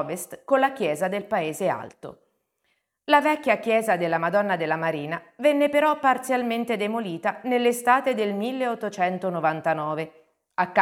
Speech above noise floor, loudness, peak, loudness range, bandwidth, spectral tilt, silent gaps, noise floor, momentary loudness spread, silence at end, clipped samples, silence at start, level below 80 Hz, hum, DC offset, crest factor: 50 dB; -24 LUFS; -4 dBFS; 2 LU; 17.5 kHz; -5 dB/octave; none; -74 dBFS; 11 LU; 0 s; under 0.1%; 0 s; -74 dBFS; none; under 0.1%; 20 dB